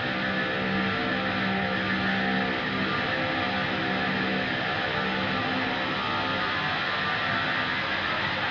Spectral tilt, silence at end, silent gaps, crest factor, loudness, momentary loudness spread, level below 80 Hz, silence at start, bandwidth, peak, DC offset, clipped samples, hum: -5.5 dB/octave; 0 s; none; 14 dB; -26 LUFS; 1 LU; -54 dBFS; 0 s; 7.2 kHz; -14 dBFS; under 0.1%; under 0.1%; none